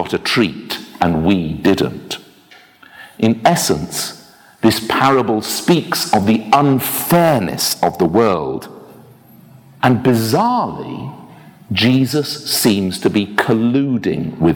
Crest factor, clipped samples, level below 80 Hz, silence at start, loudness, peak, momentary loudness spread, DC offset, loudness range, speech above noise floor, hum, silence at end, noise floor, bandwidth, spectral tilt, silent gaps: 16 dB; under 0.1%; -46 dBFS; 0 s; -15 LUFS; 0 dBFS; 11 LU; under 0.1%; 4 LU; 31 dB; none; 0 s; -46 dBFS; over 20 kHz; -5 dB/octave; none